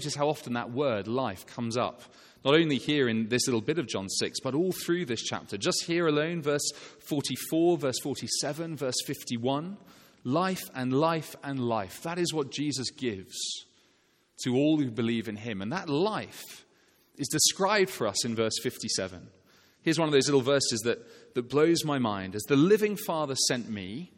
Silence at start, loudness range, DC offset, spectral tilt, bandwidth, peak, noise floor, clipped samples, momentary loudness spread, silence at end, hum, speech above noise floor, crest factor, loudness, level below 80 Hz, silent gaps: 0 s; 4 LU; under 0.1%; -4 dB/octave; 16.5 kHz; -8 dBFS; -67 dBFS; under 0.1%; 11 LU; 0.1 s; none; 39 dB; 22 dB; -29 LUFS; -70 dBFS; none